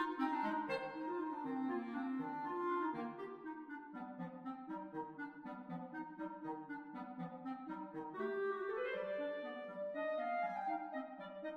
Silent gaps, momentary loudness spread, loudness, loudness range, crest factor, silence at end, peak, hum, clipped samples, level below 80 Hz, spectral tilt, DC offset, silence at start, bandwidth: none; 10 LU; -44 LUFS; 6 LU; 16 dB; 0 s; -26 dBFS; none; under 0.1%; -84 dBFS; -7.5 dB/octave; under 0.1%; 0 s; 9 kHz